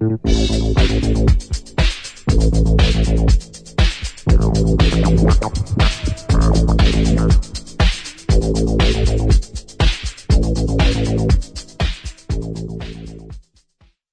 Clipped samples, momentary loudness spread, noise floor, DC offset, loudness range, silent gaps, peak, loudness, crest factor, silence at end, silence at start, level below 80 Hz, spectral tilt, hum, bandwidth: under 0.1%; 11 LU; -56 dBFS; under 0.1%; 4 LU; none; -2 dBFS; -17 LUFS; 14 dB; 0.7 s; 0 s; -18 dBFS; -6 dB/octave; none; 10 kHz